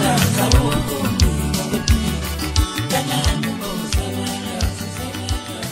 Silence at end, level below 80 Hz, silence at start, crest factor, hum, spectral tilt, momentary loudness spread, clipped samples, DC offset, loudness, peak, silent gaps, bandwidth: 0 s; -24 dBFS; 0 s; 18 dB; none; -4.5 dB/octave; 9 LU; under 0.1%; under 0.1%; -20 LUFS; 0 dBFS; none; 16.5 kHz